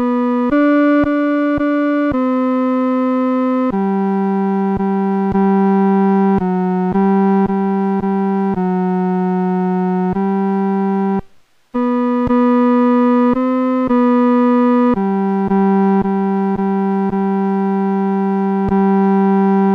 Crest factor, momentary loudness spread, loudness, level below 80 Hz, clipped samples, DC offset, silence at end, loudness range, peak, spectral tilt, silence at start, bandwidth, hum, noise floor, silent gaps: 8 dB; 4 LU; -15 LUFS; -44 dBFS; under 0.1%; under 0.1%; 0 s; 3 LU; -6 dBFS; -10.5 dB/octave; 0 s; 4.9 kHz; none; -46 dBFS; none